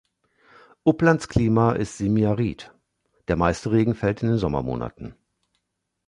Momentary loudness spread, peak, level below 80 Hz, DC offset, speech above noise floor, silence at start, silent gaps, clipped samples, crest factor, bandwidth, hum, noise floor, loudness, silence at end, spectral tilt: 14 LU; -4 dBFS; -42 dBFS; under 0.1%; 56 dB; 0.85 s; none; under 0.1%; 20 dB; 11 kHz; none; -78 dBFS; -22 LUFS; 0.95 s; -7.5 dB/octave